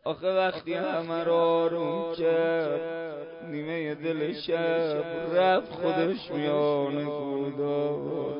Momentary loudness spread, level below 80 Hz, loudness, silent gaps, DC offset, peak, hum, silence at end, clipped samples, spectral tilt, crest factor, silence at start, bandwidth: 7 LU; -68 dBFS; -28 LUFS; none; under 0.1%; -12 dBFS; none; 0 s; under 0.1%; -10 dB/octave; 14 dB; 0.05 s; 5.4 kHz